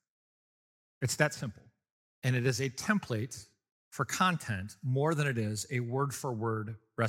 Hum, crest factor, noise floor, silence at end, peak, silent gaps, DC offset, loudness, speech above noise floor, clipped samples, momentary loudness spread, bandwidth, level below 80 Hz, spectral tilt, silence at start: none; 24 dB; under -90 dBFS; 0 s; -10 dBFS; 1.91-2.22 s, 3.72-3.91 s; under 0.1%; -33 LUFS; over 58 dB; under 0.1%; 11 LU; 16.5 kHz; -70 dBFS; -5 dB/octave; 1 s